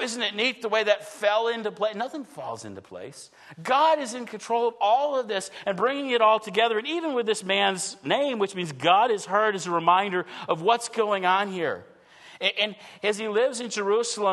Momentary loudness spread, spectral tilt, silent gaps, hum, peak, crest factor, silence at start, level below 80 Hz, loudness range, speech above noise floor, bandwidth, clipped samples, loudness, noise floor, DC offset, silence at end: 13 LU; -3 dB/octave; none; none; -6 dBFS; 20 dB; 0 s; -80 dBFS; 4 LU; 25 dB; 12.5 kHz; under 0.1%; -25 LUFS; -50 dBFS; under 0.1%; 0 s